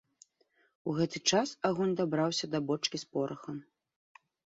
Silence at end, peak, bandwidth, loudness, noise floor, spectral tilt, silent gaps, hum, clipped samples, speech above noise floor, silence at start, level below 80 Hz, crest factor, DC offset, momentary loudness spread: 1 s; -14 dBFS; 8 kHz; -32 LUFS; -72 dBFS; -4 dB/octave; none; none; under 0.1%; 40 dB; 0.85 s; -74 dBFS; 20 dB; under 0.1%; 13 LU